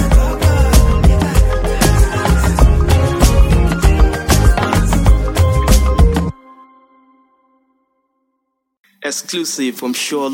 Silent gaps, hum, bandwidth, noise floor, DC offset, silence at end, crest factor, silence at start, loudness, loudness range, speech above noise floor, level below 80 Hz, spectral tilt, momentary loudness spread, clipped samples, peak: 8.77-8.84 s; none; 16.5 kHz; -71 dBFS; under 0.1%; 0 s; 12 dB; 0 s; -14 LUFS; 12 LU; 52 dB; -14 dBFS; -5.5 dB/octave; 8 LU; under 0.1%; 0 dBFS